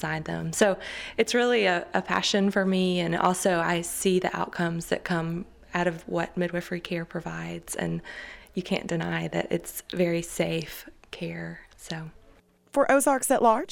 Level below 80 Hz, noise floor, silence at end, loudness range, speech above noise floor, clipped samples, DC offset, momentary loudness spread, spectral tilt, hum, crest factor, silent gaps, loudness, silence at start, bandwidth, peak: -56 dBFS; -58 dBFS; 0 s; 7 LU; 31 dB; under 0.1%; under 0.1%; 15 LU; -4.5 dB/octave; none; 20 dB; none; -27 LUFS; 0 s; 18.5 kHz; -8 dBFS